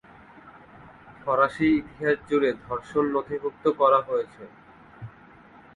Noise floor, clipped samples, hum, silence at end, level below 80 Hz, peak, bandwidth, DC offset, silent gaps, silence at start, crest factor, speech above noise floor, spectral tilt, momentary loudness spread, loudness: -51 dBFS; under 0.1%; none; 0.65 s; -58 dBFS; -8 dBFS; 10.5 kHz; under 0.1%; none; 0.45 s; 18 dB; 27 dB; -7 dB/octave; 24 LU; -25 LUFS